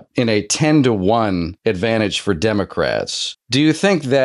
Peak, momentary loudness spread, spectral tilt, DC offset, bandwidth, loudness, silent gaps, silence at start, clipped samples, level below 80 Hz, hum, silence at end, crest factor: -4 dBFS; 6 LU; -5 dB/octave; under 0.1%; 12 kHz; -17 LUFS; none; 0.15 s; under 0.1%; -50 dBFS; none; 0 s; 14 dB